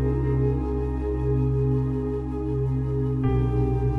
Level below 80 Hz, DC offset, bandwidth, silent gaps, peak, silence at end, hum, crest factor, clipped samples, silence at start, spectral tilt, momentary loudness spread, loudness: -30 dBFS; under 0.1%; 3.4 kHz; none; -12 dBFS; 0 s; none; 12 dB; under 0.1%; 0 s; -11 dB/octave; 4 LU; -25 LUFS